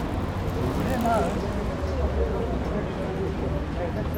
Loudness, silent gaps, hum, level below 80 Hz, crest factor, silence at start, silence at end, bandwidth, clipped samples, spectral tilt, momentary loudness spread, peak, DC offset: -27 LUFS; none; none; -32 dBFS; 14 dB; 0 s; 0 s; 18 kHz; under 0.1%; -7.5 dB/octave; 5 LU; -12 dBFS; under 0.1%